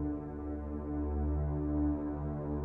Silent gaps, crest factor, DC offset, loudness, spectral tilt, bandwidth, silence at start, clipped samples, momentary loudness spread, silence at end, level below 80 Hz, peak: none; 12 dB; under 0.1%; -36 LUFS; -13 dB/octave; 2.5 kHz; 0 s; under 0.1%; 7 LU; 0 s; -40 dBFS; -22 dBFS